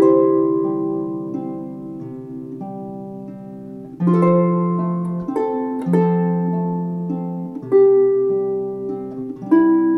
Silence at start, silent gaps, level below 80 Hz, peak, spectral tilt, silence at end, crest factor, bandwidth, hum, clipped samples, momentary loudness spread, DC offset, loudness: 0 s; none; -60 dBFS; -4 dBFS; -11.5 dB/octave; 0 s; 14 dB; 3.3 kHz; none; under 0.1%; 17 LU; under 0.1%; -19 LUFS